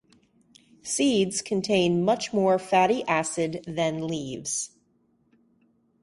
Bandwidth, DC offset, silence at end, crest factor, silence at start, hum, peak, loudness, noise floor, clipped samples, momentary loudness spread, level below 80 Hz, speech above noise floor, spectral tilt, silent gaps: 11.5 kHz; under 0.1%; 1.35 s; 18 dB; 0.85 s; none; -8 dBFS; -25 LUFS; -67 dBFS; under 0.1%; 9 LU; -64 dBFS; 42 dB; -4 dB/octave; none